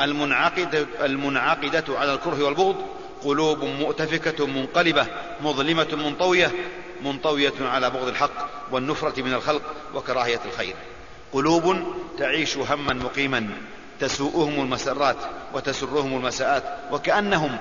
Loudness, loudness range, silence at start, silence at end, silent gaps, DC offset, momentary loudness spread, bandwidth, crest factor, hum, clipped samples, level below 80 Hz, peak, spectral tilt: -24 LUFS; 3 LU; 0 s; 0 s; none; 0.6%; 10 LU; 7.4 kHz; 18 dB; none; under 0.1%; -52 dBFS; -4 dBFS; -4 dB/octave